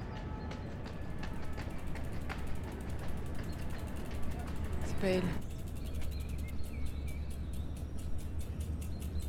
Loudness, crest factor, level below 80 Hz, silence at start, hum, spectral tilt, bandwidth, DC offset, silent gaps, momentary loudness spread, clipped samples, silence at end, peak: -41 LUFS; 18 dB; -42 dBFS; 0 s; none; -6.5 dB/octave; 16.5 kHz; under 0.1%; none; 6 LU; under 0.1%; 0 s; -20 dBFS